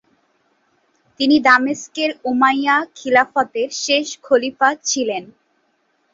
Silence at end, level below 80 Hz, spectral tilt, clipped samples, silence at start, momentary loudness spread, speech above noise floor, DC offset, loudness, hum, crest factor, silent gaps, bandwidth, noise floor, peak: 0.85 s; -64 dBFS; -1.5 dB/octave; under 0.1%; 1.2 s; 8 LU; 47 dB; under 0.1%; -17 LUFS; none; 18 dB; none; 7.8 kHz; -65 dBFS; -2 dBFS